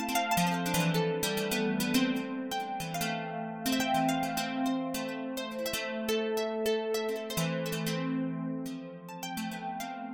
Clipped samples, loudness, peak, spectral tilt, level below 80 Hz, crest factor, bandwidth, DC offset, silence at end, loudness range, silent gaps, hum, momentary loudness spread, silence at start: under 0.1%; -32 LUFS; -16 dBFS; -4.5 dB/octave; -62 dBFS; 16 dB; 17.5 kHz; under 0.1%; 0 s; 3 LU; none; none; 9 LU; 0 s